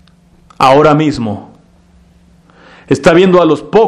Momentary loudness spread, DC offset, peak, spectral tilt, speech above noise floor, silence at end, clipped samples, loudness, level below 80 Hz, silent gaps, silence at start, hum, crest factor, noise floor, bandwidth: 12 LU; under 0.1%; 0 dBFS; -6.5 dB/octave; 37 dB; 0 s; 0.8%; -9 LUFS; -42 dBFS; none; 0.6 s; none; 12 dB; -45 dBFS; 12 kHz